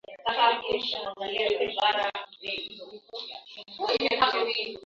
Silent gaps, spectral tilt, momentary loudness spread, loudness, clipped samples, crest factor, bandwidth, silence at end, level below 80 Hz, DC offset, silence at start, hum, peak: none; -3 dB/octave; 16 LU; -27 LUFS; under 0.1%; 20 dB; 7.6 kHz; 0.05 s; -66 dBFS; under 0.1%; 0.1 s; none; -10 dBFS